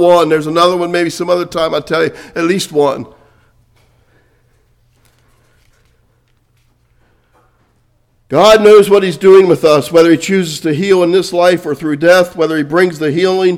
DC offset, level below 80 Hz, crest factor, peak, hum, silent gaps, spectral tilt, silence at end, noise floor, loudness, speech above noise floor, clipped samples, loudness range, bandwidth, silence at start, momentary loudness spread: under 0.1%; -50 dBFS; 12 dB; 0 dBFS; none; none; -5 dB/octave; 0 s; -55 dBFS; -10 LUFS; 46 dB; 0.9%; 11 LU; 16 kHz; 0 s; 9 LU